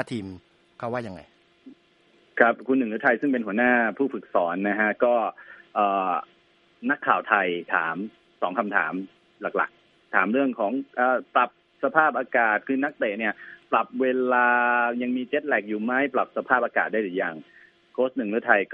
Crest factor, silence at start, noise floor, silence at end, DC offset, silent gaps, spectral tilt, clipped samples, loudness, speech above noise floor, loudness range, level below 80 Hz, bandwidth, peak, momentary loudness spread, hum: 24 dB; 0 s; -61 dBFS; 0 s; under 0.1%; none; -7 dB/octave; under 0.1%; -24 LUFS; 37 dB; 3 LU; -74 dBFS; 9 kHz; -2 dBFS; 11 LU; none